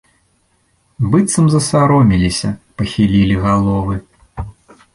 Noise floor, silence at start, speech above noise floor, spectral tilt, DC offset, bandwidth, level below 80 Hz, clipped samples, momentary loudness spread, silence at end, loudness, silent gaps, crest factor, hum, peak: -59 dBFS; 1 s; 46 dB; -6 dB/octave; under 0.1%; 11.5 kHz; -34 dBFS; under 0.1%; 19 LU; 0.45 s; -14 LUFS; none; 14 dB; none; -2 dBFS